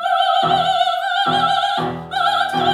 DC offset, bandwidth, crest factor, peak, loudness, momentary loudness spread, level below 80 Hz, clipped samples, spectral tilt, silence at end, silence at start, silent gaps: under 0.1%; 14.5 kHz; 14 dB; -4 dBFS; -17 LUFS; 4 LU; -56 dBFS; under 0.1%; -4 dB/octave; 0 s; 0 s; none